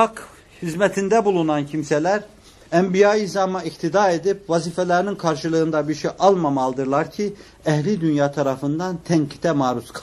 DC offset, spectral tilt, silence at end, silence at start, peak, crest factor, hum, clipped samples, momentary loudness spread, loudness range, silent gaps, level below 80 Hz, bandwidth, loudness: under 0.1%; -6 dB/octave; 0 s; 0 s; -2 dBFS; 18 dB; none; under 0.1%; 8 LU; 2 LU; none; -56 dBFS; 12.5 kHz; -20 LUFS